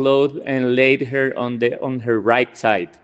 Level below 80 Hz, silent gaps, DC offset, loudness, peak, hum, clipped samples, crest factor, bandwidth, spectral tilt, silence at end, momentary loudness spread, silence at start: -64 dBFS; none; under 0.1%; -18 LUFS; 0 dBFS; none; under 0.1%; 18 dB; 8.2 kHz; -6.5 dB/octave; 0.2 s; 6 LU; 0 s